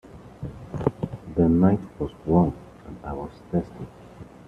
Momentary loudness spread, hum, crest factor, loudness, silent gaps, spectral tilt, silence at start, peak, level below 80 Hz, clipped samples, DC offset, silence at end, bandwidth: 21 LU; none; 20 dB; -25 LUFS; none; -10.5 dB/octave; 0.05 s; -6 dBFS; -46 dBFS; under 0.1%; under 0.1%; 0.05 s; 5.2 kHz